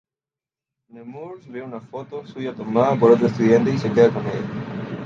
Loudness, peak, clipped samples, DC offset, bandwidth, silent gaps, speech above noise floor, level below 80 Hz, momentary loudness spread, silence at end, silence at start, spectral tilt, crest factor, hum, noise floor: -19 LUFS; -2 dBFS; under 0.1%; under 0.1%; 7.2 kHz; none; over 70 dB; -60 dBFS; 19 LU; 0 s; 0.95 s; -8 dB/octave; 18 dB; none; under -90 dBFS